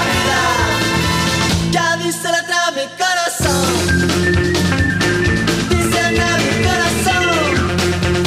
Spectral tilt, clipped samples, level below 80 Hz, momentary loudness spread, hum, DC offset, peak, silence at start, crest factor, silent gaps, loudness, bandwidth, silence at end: -4 dB/octave; under 0.1%; -30 dBFS; 2 LU; none; under 0.1%; -2 dBFS; 0 s; 12 dB; none; -15 LUFS; 15.5 kHz; 0 s